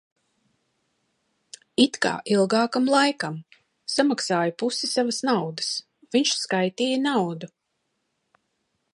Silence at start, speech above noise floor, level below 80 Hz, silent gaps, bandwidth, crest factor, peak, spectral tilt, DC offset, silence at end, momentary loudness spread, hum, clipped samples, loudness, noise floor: 1.8 s; 53 dB; -74 dBFS; none; 11.5 kHz; 20 dB; -6 dBFS; -3.5 dB/octave; under 0.1%; 1.5 s; 10 LU; none; under 0.1%; -23 LUFS; -76 dBFS